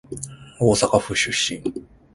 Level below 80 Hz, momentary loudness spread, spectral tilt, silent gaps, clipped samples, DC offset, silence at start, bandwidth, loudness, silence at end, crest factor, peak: -46 dBFS; 16 LU; -3.5 dB/octave; none; under 0.1%; under 0.1%; 0.1 s; 11.5 kHz; -20 LUFS; 0.3 s; 22 dB; -2 dBFS